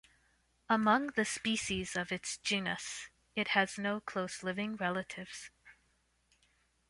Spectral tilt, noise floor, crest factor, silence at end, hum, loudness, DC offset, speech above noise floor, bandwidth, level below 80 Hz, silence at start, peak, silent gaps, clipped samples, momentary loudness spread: -3.5 dB/octave; -75 dBFS; 22 dB; 1.2 s; 60 Hz at -60 dBFS; -34 LUFS; under 0.1%; 40 dB; 11.5 kHz; -66 dBFS; 0.7 s; -14 dBFS; none; under 0.1%; 14 LU